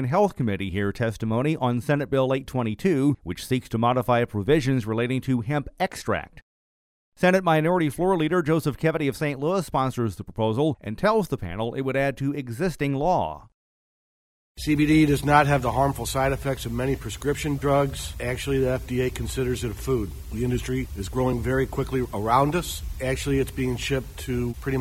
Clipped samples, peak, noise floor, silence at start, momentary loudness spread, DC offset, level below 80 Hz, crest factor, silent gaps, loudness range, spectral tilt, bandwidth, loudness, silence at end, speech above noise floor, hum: under 0.1%; -6 dBFS; under -90 dBFS; 0 s; 8 LU; under 0.1%; -40 dBFS; 20 dB; 6.43-7.12 s, 13.54-14.55 s; 4 LU; -6 dB/octave; 16.5 kHz; -25 LUFS; 0 s; over 66 dB; none